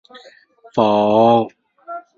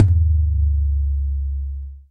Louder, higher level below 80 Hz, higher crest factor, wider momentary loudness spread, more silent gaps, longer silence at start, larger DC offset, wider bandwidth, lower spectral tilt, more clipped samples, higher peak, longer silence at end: first, -15 LUFS vs -21 LUFS; second, -60 dBFS vs -20 dBFS; about the same, 16 dB vs 18 dB; first, 20 LU vs 11 LU; neither; first, 0.75 s vs 0 s; neither; first, 7.2 kHz vs 0.7 kHz; second, -7.5 dB/octave vs -10.5 dB/octave; neither; about the same, -2 dBFS vs 0 dBFS; about the same, 0.2 s vs 0.1 s